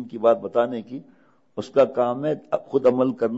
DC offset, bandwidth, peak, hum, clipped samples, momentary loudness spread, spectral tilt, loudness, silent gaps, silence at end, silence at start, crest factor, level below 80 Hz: under 0.1%; 8 kHz; -6 dBFS; none; under 0.1%; 16 LU; -7.5 dB/octave; -22 LUFS; none; 0 s; 0 s; 16 dB; -68 dBFS